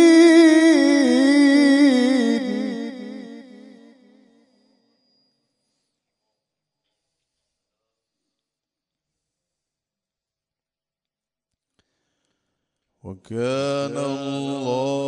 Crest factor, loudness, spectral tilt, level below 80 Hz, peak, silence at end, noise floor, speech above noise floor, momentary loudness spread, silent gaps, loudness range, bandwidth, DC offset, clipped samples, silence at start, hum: 18 dB; -17 LUFS; -4.5 dB/octave; -76 dBFS; -4 dBFS; 0 s; under -90 dBFS; over 65 dB; 19 LU; none; 20 LU; 11 kHz; under 0.1%; under 0.1%; 0 s; none